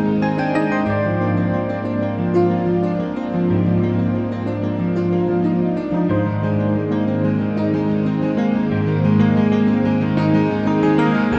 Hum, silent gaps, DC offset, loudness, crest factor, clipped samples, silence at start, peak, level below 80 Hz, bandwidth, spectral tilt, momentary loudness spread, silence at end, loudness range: none; none; under 0.1%; -18 LUFS; 14 dB; under 0.1%; 0 s; -2 dBFS; -46 dBFS; 8 kHz; -9.5 dB/octave; 5 LU; 0 s; 2 LU